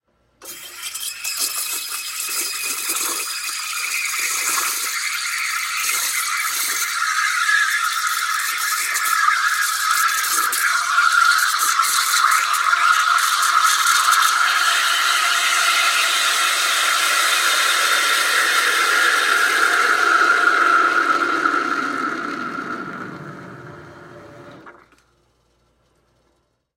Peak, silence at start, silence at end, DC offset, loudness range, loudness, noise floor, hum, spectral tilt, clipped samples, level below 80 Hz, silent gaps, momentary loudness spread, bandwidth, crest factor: -4 dBFS; 0.4 s; 2.05 s; under 0.1%; 7 LU; -17 LUFS; -66 dBFS; none; 1.5 dB/octave; under 0.1%; -68 dBFS; none; 9 LU; 16.5 kHz; 16 dB